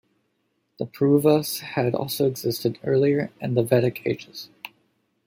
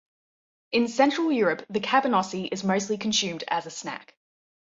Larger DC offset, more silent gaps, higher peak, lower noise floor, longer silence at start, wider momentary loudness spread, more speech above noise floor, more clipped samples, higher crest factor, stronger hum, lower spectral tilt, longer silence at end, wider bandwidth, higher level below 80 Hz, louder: neither; neither; about the same, -6 dBFS vs -6 dBFS; second, -72 dBFS vs under -90 dBFS; about the same, 0.8 s vs 0.7 s; first, 18 LU vs 11 LU; second, 50 dB vs over 65 dB; neither; about the same, 18 dB vs 20 dB; neither; first, -6 dB/octave vs -3.5 dB/octave; second, 0.6 s vs 0.8 s; first, 17 kHz vs 8 kHz; about the same, -66 dBFS vs -70 dBFS; about the same, -23 LUFS vs -25 LUFS